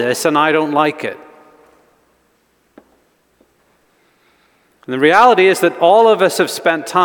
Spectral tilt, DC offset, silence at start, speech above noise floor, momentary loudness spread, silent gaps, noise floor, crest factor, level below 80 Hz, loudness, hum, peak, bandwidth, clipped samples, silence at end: -4 dB/octave; under 0.1%; 0 s; 47 dB; 15 LU; none; -59 dBFS; 16 dB; -64 dBFS; -12 LUFS; none; 0 dBFS; 19.5 kHz; under 0.1%; 0 s